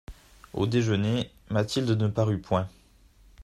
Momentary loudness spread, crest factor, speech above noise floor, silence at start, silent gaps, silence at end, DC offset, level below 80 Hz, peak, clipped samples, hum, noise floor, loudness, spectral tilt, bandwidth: 6 LU; 18 dB; 31 dB; 0.1 s; none; 0 s; under 0.1%; -52 dBFS; -10 dBFS; under 0.1%; none; -57 dBFS; -27 LUFS; -6.5 dB/octave; 12.5 kHz